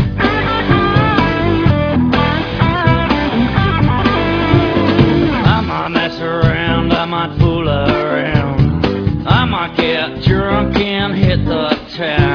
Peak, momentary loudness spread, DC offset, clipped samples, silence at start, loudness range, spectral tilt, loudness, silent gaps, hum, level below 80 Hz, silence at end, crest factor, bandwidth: 0 dBFS; 4 LU; under 0.1%; under 0.1%; 0 s; 2 LU; -8 dB/octave; -14 LUFS; none; none; -26 dBFS; 0 s; 14 dB; 5.4 kHz